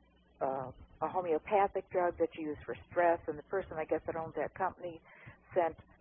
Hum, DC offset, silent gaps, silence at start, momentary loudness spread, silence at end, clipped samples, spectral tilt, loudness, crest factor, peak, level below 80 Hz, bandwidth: none; under 0.1%; none; 0.4 s; 14 LU; 0.2 s; under 0.1%; -1 dB/octave; -35 LUFS; 18 dB; -16 dBFS; -62 dBFS; 3.6 kHz